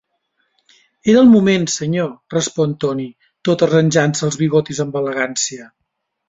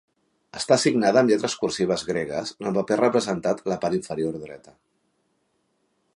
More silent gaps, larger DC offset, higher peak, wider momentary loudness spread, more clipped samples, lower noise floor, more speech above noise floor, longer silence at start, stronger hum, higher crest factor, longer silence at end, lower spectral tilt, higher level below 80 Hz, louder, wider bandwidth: neither; neither; about the same, -2 dBFS vs -4 dBFS; about the same, 12 LU vs 11 LU; neither; about the same, -68 dBFS vs -71 dBFS; first, 53 dB vs 48 dB; first, 1.05 s vs 0.55 s; neither; second, 16 dB vs 22 dB; second, 0.6 s vs 1.6 s; about the same, -5 dB/octave vs -4.5 dB/octave; first, -56 dBFS vs -62 dBFS; first, -16 LUFS vs -23 LUFS; second, 8 kHz vs 11.5 kHz